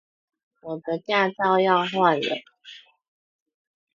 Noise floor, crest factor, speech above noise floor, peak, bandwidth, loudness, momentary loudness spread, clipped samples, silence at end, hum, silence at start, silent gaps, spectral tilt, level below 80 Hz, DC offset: -48 dBFS; 20 dB; 26 dB; -4 dBFS; 7.4 kHz; -22 LUFS; 14 LU; under 0.1%; 1.2 s; none; 0.65 s; none; -6 dB/octave; -76 dBFS; under 0.1%